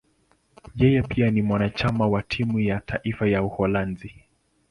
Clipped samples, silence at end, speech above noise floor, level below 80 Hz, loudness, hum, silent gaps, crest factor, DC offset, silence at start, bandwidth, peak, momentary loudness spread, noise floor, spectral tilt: under 0.1%; 0.6 s; 42 dB; -44 dBFS; -23 LUFS; none; none; 18 dB; under 0.1%; 0.75 s; 11 kHz; -6 dBFS; 10 LU; -65 dBFS; -8.5 dB/octave